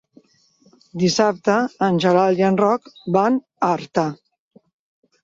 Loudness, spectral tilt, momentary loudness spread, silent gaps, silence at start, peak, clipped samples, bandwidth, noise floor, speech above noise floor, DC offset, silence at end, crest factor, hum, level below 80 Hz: -19 LUFS; -5.5 dB/octave; 7 LU; none; 0.95 s; -4 dBFS; under 0.1%; 7.8 kHz; -57 dBFS; 39 dB; under 0.1%; 1.1 s; 18 dB; none; -62 dBFS